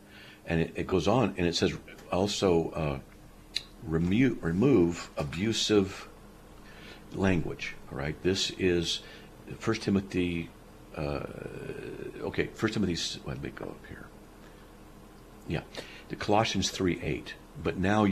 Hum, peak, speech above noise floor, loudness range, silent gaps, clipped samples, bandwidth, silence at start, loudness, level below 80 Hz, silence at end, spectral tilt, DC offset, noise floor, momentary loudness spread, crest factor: none; -10 dBFS; 21 dB; 7 LU; none; under 0.1%; 14.5 kHz; 0.05 s; -30 LUFS; -50 dBFS; 0 s; -5 dB/octave; under 0.1%; -51 dBFS; 18 LU; 20 dB